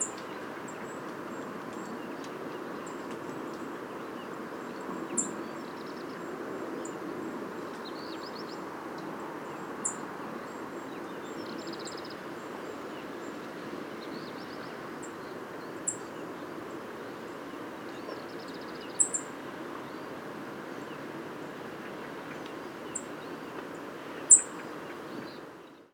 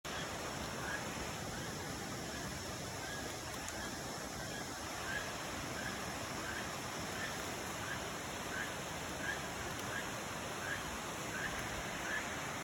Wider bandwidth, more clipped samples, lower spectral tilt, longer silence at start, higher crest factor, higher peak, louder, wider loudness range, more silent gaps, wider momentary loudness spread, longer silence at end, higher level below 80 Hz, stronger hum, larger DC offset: about the same, over 20 kHz vs 19 kHz; neither; about the same, -2 dB/octave vs -3 dB/octave; about the same, 0 s vs 0.05 s; first, 32 dB vs 18 dB; first, -4 dBFS vs -24 dBFS; first, -35 LUFS vs -41 LUFS; first, 13 LU vs 2 LU; neither; first, 7 LU vs 3 LU; about the same, 0.05 s vs 0 s; second, -74 dBFS vs -58 dBFS; neither; neither